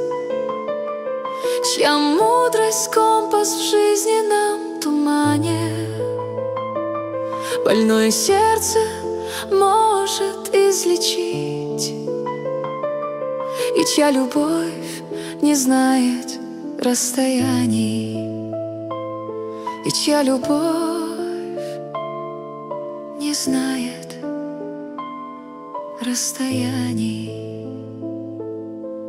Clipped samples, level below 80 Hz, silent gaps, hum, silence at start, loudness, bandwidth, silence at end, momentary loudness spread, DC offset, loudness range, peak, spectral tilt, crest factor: under 0.1%; -60 dBFS; none; none; 0 s; -20 LUFS; 16 kHz; 0 s; 14 LU; under 0.1%; 8 LU; -2 dBFS; -3.5 dB/octave; 18 dB